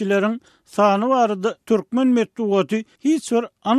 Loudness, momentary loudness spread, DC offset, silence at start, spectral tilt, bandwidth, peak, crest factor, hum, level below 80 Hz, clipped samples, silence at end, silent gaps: -20 LUFS; 7 LU; under 0.1%; 0 s; -6 dB/octave; 13 kHz; -4 dBFS; 14 dB; none; -70 dBFS; under 0.1%; 0 s; none